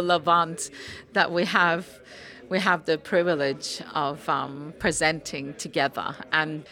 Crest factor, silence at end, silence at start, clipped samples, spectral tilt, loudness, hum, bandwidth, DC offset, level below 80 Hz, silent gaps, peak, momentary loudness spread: 20 dB; 0 s; 0 s; under 0.1%; -3.5 dB/octave; -25 LUFS; none; 17 kHz; under 0.1%; -58 dBFS; none; -4 dBFS; 13 LU